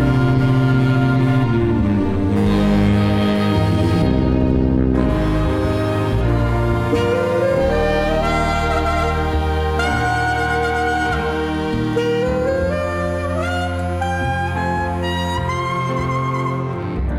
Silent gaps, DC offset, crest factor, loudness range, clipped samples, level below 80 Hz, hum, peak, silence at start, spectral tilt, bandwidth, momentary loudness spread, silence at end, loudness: none; under 0.1%; 14 dB; 4 LU; under 0.1%; -26 dBFS; none; -4 dBFS; 0 s; -7 dB/octave; 14.5 kHz; 5 LU; 0 s; -18 LUFS